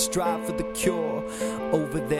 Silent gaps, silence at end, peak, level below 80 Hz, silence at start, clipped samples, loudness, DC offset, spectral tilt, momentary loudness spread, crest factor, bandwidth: none; 0 s; -10 dBFS; -48 dBFS; 0 s; under 0.1%; -27 LUFS; under 0.1%; -4.5 dB/octave; 4 LU; 18 dB; 16 kHz